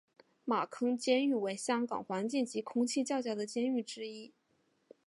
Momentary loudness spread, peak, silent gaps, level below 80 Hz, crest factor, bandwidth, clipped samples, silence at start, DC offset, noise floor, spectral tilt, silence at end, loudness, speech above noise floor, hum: 12 LU; -16 dBFS; none; -86 dBFS; 18 dB; 11.5 kHz; under 0.1%; 0.45 s; under 0.1%; -75 dBFS; -4 dB/octave; 0.8 s; -34 LUFS; 41 dB; none